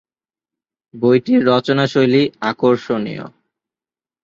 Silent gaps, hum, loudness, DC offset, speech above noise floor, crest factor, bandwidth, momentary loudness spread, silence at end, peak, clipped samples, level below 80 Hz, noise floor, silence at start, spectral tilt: none; none; -16 LUFS; under 0.1%; over 75 dB; 16 dB; 7.4 kHz; 8 LU; 0.95 s; -2 dBFS; under 0.1%; -60 dBFS; under -90 dBFS; 0.95 s; -7 dB/octave